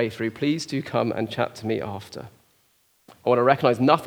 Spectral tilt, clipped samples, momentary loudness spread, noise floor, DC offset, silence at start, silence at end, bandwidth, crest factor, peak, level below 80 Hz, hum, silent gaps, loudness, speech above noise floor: -6 dB/octave; under 0.1%; 15 LU; -64 dBFS; under 0.1%; 0 s; 0 s; over 20 kHz; 22 dB; -2 dBFS; -66 dBFS; none; none; -24 LUFS; 41 dB